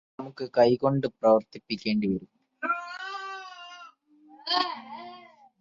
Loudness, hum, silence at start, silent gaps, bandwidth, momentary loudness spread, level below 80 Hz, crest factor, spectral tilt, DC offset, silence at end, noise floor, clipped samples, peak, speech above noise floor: -27 LUFS; none; 0.2 s; none; 7.4 kHz; 20 LU; -66 dBFS; 22 dB; -6.5 dB/octave; under 0.1%; 0.4 s; -56 dBFS; under 0.1%; -8 dBFS; 31 dB